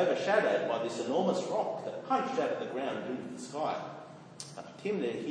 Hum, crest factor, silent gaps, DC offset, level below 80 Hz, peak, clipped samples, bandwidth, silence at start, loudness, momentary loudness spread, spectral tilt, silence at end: none; 18 dB; none; under 0.1%; -82 dBFS; -14 dBFS; under 0.1%; 10.5 kHz; 0 s; -33 LUFS; 17 LU; -5 dB/octave; 0 s